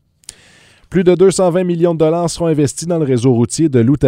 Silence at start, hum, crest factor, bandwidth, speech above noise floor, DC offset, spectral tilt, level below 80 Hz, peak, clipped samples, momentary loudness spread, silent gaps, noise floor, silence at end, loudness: 0.9 s; none; 14 dB; 15 kHz; 34 dB; under 0.1%; -6.5 dB/octave; -44 dBFS; 0 dBFS; under 0.1%; 5 LU; none; -47 dBFS; 0 s; -14 LUFS